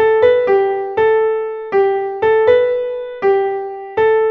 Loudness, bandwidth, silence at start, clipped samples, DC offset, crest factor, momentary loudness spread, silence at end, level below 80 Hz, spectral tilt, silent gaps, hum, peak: -15 LUFS; 4.8 kHz; 0 s; under 0.1%; under 0.1%; 12 dB; 9 LU; 0 s; -52 dBFS; -7 dB/octave; none; none; -2 dBFS